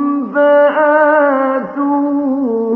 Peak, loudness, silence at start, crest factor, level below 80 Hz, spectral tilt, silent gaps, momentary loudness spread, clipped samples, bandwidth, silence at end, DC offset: 0 dBFS; -12 LUFS; 0 s; 12 dB; -64 dBFS; -8.5 dB/octave; none; 6 LU; under 0.1%; 3.4 kHz; 0 s; under 0.1%